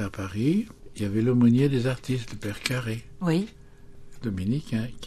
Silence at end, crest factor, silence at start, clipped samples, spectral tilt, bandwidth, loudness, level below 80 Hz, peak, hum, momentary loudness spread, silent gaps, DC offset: 0 s; 22 dB; 0 s; under 0.1%; -7 dB/octave; 13.5 kHz; -26 LUFS; -50 dBFS; -4 dBFS; none; 14 LU; none; under 0.1%